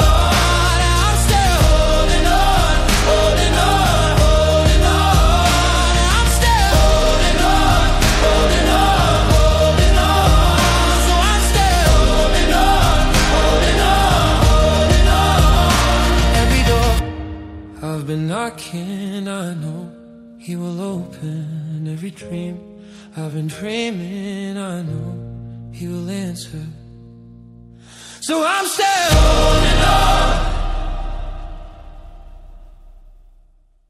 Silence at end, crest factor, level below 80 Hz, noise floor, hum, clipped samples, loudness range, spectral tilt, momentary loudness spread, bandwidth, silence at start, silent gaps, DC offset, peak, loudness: 1.25 s; 14 dB; -18 dBFS; -52 dBFS; none; under 0.1%; 13 LU; -4.5 dB/octave; 15 LU; 15 kHz; 0 s; none; under 0.1%; -2 dBFS; -15 LUFS